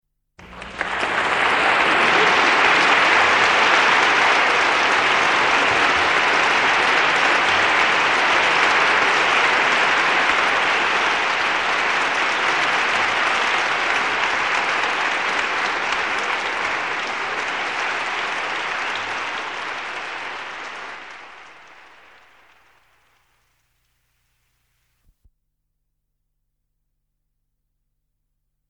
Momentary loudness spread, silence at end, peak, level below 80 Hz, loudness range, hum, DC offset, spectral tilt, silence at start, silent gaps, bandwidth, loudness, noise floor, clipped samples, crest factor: 12 LU; 7.15 s; -4 dBFS; -56 dBFS; 12 LU; 50 Hz at -70 dBFS; 0.2%; -1.5 dB/octave; 0.4 s; none; 11 kHz; -17 LUFS; -74 dBFS; under 0.1%; 18 dB